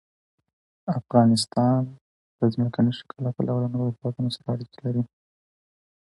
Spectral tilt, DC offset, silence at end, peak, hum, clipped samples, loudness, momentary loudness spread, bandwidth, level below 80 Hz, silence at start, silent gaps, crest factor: -7 dB/octave; under 0.1%; 0.95 s; -6 dBFS; none; under 0.1%; -25 LUFS; 11 LU; 11.5 kHz; -64 dBFS; 0.85 s; 2.01-2.39 s; 20 dB